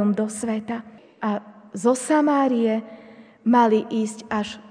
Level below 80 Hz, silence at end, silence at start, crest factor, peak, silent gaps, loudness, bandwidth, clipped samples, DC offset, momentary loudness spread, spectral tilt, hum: -68 dBFS; 0 s; 0 s; 16 dB; -6 dBFS; none; -22 LUFS; 10 kHz; under 0.1%; under 0.1%; 13 LU; -5.5 dB/octave; none